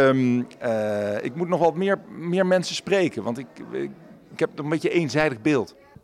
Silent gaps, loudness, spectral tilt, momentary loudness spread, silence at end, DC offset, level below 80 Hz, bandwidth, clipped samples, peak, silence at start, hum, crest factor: none; -24 LUFS; -6 dB/octave; 11 LU; 0.35 s; under 0.1%; -64 dBFS; 13.5 kHz; under 0.1%; -8 dBFS; 0 s; none; 16 dB